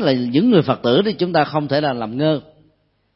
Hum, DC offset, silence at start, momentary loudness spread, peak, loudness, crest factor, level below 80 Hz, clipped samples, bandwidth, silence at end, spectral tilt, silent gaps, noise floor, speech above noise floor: none; under 0.1%; 0 s; 6 LU; -2 dBFS; -18 LUFS; 16 dB; -56 dBFS; under 0.1%; 5.8 kHz; 0.75 s; -11 dB/octave; none; -61 dBFS; 44 dB